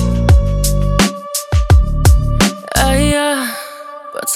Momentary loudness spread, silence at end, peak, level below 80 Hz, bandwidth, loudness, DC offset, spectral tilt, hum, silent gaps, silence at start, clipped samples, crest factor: 11 LU; 0 s; 0 dBFS; -16 dBFS; 16.5 kHz; -14 LUFS; under 0.1%; -5 dB/octave; none; none; 0 s; under 0.1%; 12 dB